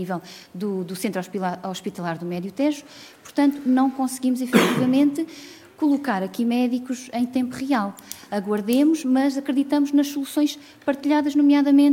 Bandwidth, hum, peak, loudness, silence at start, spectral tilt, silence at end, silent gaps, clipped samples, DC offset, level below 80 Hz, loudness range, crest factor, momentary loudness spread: 17 kHz; none; -2 dBFS; -22 LUFS; 0 s; -5.5 dB/octave; 0 s; none; under 0.1%; under 0.1%; -70 dBFS; 4 LU; 20 dB; 12 LU